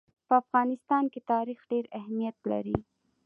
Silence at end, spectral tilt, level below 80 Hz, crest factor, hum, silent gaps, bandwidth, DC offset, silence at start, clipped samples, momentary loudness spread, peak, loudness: 0.45 s; -9.5 dB/octave; -58 dBFS; 20 dB; none; none; 4.8 kHz; under 0.1%; 0.3 s; under 0.1%; 8 LU; -10 dBFS; -30 LUFS